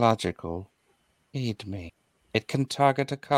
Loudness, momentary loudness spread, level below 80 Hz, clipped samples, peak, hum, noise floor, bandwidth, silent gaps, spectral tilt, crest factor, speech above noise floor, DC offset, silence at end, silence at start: -29 LUFS; 15 LU; -58 dBFS; under 0.1%; -6 dBFS; none; -69 dBFS; 15.5 kHz; none; -6 dB/octave; 22 dB; 42 dB; under 0.1%; 0 s; 0 s